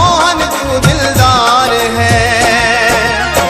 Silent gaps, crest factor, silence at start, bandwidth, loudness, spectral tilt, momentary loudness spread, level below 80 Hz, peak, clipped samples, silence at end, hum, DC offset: none; 10 dB; 0 s; 16 kHz; -9 LUFS; -3.5 dB/octave; 3 LU; -26 dBFS; 0 dBFS; 0.2%; 0 s; none; under 0.1%